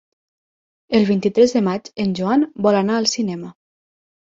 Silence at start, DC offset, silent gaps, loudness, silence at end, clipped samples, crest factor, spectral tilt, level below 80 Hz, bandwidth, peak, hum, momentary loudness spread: 0.9 s; under 0.1%; none; -18 LUFS; 0.85 s; under 0.1%; 18 dB; -5.5 dB/octave; -60 dBFS; 7.8 kHz; -2 dBFS; none; 8 LU